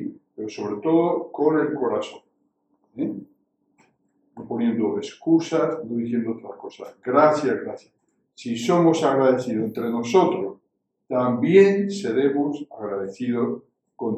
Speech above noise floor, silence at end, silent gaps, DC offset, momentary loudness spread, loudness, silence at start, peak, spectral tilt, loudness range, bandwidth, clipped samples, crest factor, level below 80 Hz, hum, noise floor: 53 dB; 0 s; none; under 0.1%; 17 LU; -22 LUFS; 0 s; -2 dBFS; -6.5 dB/octave; 7 LU; 8.8 kHz; under 0.1%; 20 dB; -70 dBFS; none; -74 dBFS